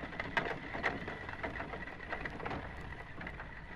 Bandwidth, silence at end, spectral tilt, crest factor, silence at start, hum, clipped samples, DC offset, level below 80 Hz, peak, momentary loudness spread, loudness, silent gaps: 12.5 kHz; 0 s; -6 dB/octave; 26 dB; 0 s; none; under 0.1%; under 0.1%; -52 dBFS; -14 dBFS; 9 LU; -41 LUFS; none